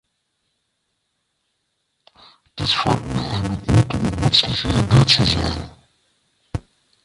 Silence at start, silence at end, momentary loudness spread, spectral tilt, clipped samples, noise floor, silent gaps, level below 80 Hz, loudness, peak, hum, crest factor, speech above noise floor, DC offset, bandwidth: 2.55 s; 0.45 s; 18 LU; -5 dB/octave; under 0.1%; -73 dBFS; none; -36 dBFS; -18 LUFS; 0 dBFS; none; 20 dB; 55 dB; under 0.1%; 11.5 kHz